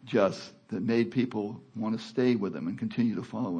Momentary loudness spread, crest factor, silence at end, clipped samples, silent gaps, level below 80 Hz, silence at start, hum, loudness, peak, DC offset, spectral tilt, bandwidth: 9 LU; 20 dB; 0 s; under 0.1%; none; -74 dBFS; 0 s; none; -30 LUFS; -10 dBFS; under 0.1%; -7 dB/octave; 9.2 kHz